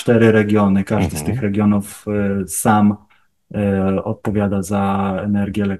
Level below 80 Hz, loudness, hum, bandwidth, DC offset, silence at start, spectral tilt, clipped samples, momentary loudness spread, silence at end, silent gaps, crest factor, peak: -44 dBFS; -17 LUFS; none; 12.5 kHz; 0.2%; 0 s; -6.5 dB/octave; under 0.1%; 8 LU; 0 s; none; 16 dB; 0 dBFS